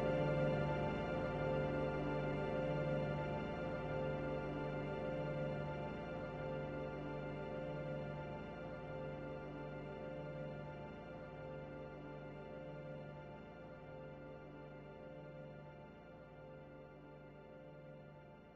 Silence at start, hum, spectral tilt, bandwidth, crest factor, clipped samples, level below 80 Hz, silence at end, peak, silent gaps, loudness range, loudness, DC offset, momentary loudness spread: 0 s; none; -8.5 dB/octave; 7.4 kHz; 16 dB; under 0.1%; -60 dBFS; 0 s; -28 dBFS; none; 14 LU; -44 LUFS; under 0.1%; 17 LU